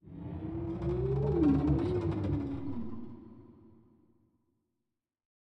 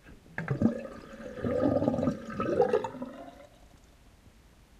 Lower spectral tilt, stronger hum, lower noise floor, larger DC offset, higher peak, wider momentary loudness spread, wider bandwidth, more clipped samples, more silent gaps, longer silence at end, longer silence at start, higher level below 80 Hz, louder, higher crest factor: first, -10.5 dB/octave vs -8 dB/octave; neither; first, -88 dBFS vs -58 dBFS; neither; second, -16 dBFS vs -10 dBFS; about the same, 18 LU vs 17 LU; second, 6 kHz vs 12.5 kHz; neither; neither; first, 1.75 s vs 0.5 s; about the same, 0.05 s vs 0.05 s; first, -46 dBFS vs -56 dBFS; about the same, -32 LUFS vs -30 LUFS; about the same, 18 dB vs 22 dB